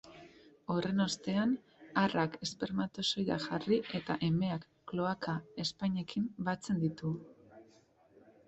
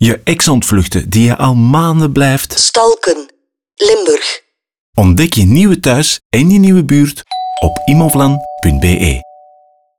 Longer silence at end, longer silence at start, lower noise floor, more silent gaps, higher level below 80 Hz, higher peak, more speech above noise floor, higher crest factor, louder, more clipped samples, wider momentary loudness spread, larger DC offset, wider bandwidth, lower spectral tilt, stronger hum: about the same, 0.85 s vs 0.75 s; about the same, 0.05 s vs 0 s; first, -65 dBFS vs -48 dBFS; second, none vs 4.79-4.93 s, 6.25-6.30 s; second, -68 dBFS vs -28 dBFS; second, -16 dBFS vs 0 dBFS; second, 31 dB vs 38 dB; first, 20 dB vs 10 dB; second, -35 LUFS vs -10 LUFS; neither; about the same, 7 LU vs 7 LU; second, under 0.1% vs 1%; second, 8.2 kHz vs 20 kHz; about the same, -5.5 dB/octave vs -5 dB/octave; neither